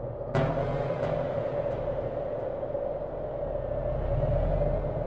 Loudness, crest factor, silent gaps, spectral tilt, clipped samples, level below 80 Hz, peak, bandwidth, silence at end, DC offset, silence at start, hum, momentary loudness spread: -31 LUFS; 16 dB; none; -9 dB/octave; under 0.1%; -38 dBFS; -14 dBFS; 6.8 kHz; 0 s; 0.2%; 0 s; none; 5 LU